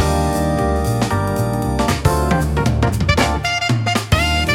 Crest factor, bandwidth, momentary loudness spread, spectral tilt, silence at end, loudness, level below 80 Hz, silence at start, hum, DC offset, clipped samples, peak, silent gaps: 16 dB; 17 kHz; 3 LU; -5.5 dB/octave; 0 s; -17 LUFS; -26 dBFS; 0 s; none; under 0.1%; under 0.1%; -2 dBFS; none